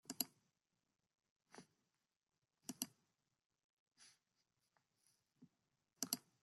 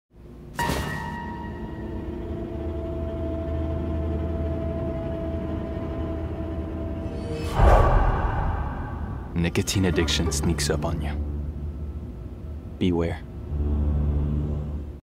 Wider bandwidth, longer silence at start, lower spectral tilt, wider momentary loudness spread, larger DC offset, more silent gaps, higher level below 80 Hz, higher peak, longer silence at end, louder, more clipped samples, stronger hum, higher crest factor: second, 13.5 kHz vs 15.5 kHz; about the same, 0.1 s vs 0.15 s; second, -1 dB/octave vs -5.5 dB/octave; first, 23 LU vs 11 LU; neither; first, 1.30-1.40 s, 3.46-3.50 s, 3.64-3.86 s vs none; second, under -90 dBFS vs -30 dBFS; second, -22 dBFS vs -4 dBFS; first, 0.25 s vs 0.05 s; second, -48 LUFS vs -27 LUFS; neither; neither; first, 36 dB vs 20 dB